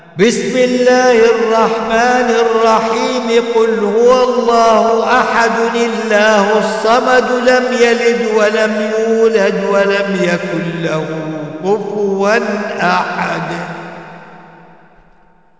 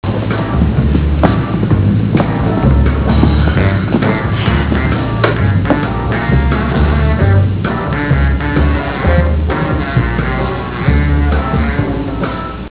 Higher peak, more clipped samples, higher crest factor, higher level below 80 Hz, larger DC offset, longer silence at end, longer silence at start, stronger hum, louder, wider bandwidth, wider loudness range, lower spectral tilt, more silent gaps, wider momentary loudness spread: about the same, -2 dBFS vs 0 dBFS; neither; about the same, 12 dB vs 12 dB; second, -52 dBFS vs -18 dBFS; about the same, 0.3% vs 0.3%; first, 1.2 s vs 0 s; about the same, 0.15 s vs 0.05 s; neither; about the same, -12 LUFS vs -13 LUFS; first, 8 kHz vs 4 kHz; first, 5 LU vs 2 LU; second, -4.5 dB/octave vs -11.5 dB/octave; neither; first, 8 LU vs 5 LU